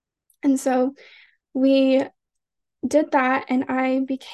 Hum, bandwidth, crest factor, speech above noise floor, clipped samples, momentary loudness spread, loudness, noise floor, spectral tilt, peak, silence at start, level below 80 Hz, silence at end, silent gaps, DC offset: none; 12.5 kHz; 16 dB; 63 dB; under 0.1%; 9 LU; -21 LUFS; -83 dBFS; -4 dB/octave; -6 dBFS; 0.45 s; -68 dBFS; 0 s; none; under 0.1%